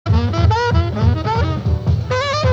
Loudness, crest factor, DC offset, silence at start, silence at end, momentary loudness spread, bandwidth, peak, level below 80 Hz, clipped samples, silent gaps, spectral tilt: -17 LUFS; 12 dB; under 0.1%; 0.05 s; 0 s; 3 LU; 7.6 kHz; -2 dBFS; -26 dBFS; under 0.1%; none; -7 dB/octave